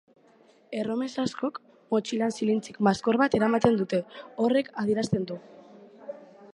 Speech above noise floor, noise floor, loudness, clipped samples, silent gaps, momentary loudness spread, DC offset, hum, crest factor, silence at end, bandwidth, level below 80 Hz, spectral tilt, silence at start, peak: 33 dB; -59 dBFS; -27 LUFS; under 0.1%; none; 19 LU; under 0.1%; none; 22 dB; 0.1 s; 11 kHz; -64 dBFS; -6 dB/octave; 0.7 s; -6 dBFS